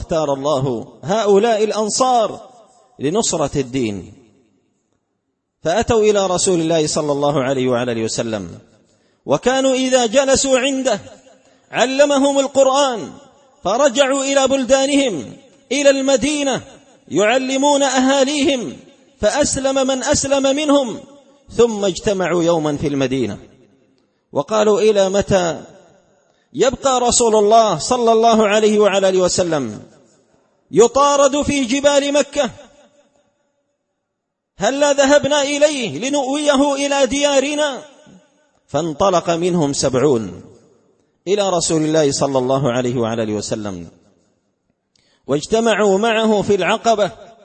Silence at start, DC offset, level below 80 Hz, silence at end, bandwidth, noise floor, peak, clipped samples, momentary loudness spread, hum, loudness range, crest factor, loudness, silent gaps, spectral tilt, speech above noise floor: 0 s; under 0.1%; -46 dBFS; 0.2 s; 8.8 kHz; -76 dBFS; 0 dBFS; under 0.1%; 11 LU; none; 4 LU; 16 dB; -16 LUFS; none; -3.5 dB/octave; 60 dB